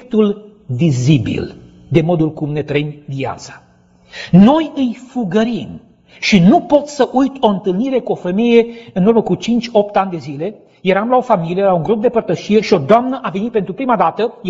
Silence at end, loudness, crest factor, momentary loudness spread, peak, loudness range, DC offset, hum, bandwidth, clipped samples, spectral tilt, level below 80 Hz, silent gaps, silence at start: 0 s; -15 LUFS; 14 dB; 13 LU; 0 dBFS; 4 LU; under 0.1%; none; 8 kHz; under 0.1%; -7 dB/octave; -46 dBFS; none; 0 s